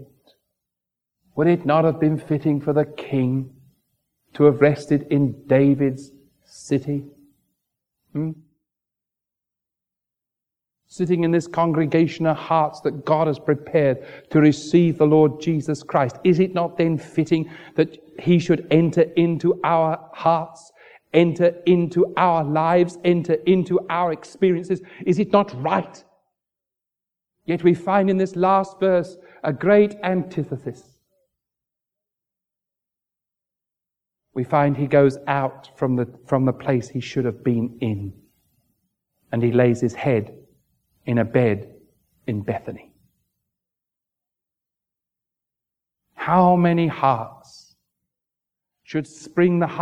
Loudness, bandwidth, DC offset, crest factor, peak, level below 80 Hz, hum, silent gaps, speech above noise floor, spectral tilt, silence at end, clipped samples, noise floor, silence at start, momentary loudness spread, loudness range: -20 LUFS; 9.8 kHz; under 0.1%; 20 dB; -2 dBFS; -62 dBFS; none; none; 67 dB; -8 dB/octave; 0 s; under 0.1%; -87 dBFS; 0 s; 12 LU; 10 LU